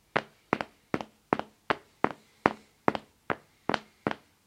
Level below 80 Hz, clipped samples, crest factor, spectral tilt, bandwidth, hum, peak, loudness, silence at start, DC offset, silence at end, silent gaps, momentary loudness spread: -66 dBFS; under 0.1%; 32 dB; -6 dB/octave; 16 kHz; none; 0 dBFS; -33 LUFS; 0.15 s; under 0.1%; 0.3 s; none; 7 LU